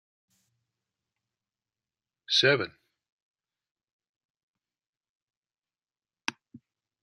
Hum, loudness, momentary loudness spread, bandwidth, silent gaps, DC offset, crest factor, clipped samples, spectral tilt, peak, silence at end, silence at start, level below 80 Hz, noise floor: none; -26 LUFS; 15 LU; 12 kHz; 3.12-3.34 s, 3.71-3.75 s, 3.92-3.99 s, 4.09-4.35 s, 4.43-4.54 s, 4.87-5.01 s, 5.09-5.27 s, 5.37-5.43 s; under 0.1%; 28 dB; under 0.1%; -3 dB/octave; -8 dBFS; 0.45 s; 2.3 s; -82 dBFS; under -90 dBFS